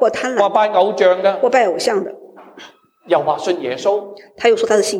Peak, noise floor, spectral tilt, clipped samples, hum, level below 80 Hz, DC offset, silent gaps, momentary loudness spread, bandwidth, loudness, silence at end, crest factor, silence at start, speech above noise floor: -2 dBFS; -42 dBFS; -3.5 dB/octave; under 0.1%; none; -66 dBFS; under 0.1%; none; 7 LU; 14 kHz; -16 LUFS; 0 s; 14 dB; 0 s; 27 dB